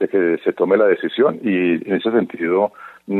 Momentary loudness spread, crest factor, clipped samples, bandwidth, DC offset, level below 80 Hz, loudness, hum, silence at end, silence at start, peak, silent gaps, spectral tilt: 4 LU; 16 dB; under 0.1%; 4.2 kHz; under 0.1%; -70 dBFS; -18 LUFS; none; 0 s; 0 s; -2 dBFS; none; -8.5 dB/octave